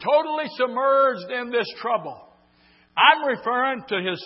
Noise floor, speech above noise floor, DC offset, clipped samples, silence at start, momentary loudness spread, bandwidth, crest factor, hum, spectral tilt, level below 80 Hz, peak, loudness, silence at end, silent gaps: -58 dBFS; 36 dB; under 0.1%; under 0.1%; 0 s; 11 LU; 5.8 kHz; 20 dB; none; -7.5 dB/octave; -74 dBFS; -2 dBFS; -22 LUFS; 0 s; none